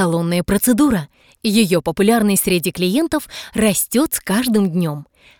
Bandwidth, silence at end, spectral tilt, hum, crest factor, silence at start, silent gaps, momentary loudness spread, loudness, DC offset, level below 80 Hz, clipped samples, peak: 19.5 kHz; 0.35 s; -4.5 dB/octave; none; 16 dB; 0 s; none; 9 LU; -17 LUFS; 0.1%; -44 dBFS; under 0.1%; 0 dBFS